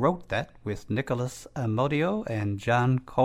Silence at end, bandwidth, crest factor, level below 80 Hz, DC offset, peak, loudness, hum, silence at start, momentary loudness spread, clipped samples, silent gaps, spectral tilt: 0 s; 14.5 kHz; 16 dB; -54 dBFS; under 0.1%; -10 dBFS; -28 LUFS; none; 0 s; 9 LU; under 0.1%; none; -7 dB/octave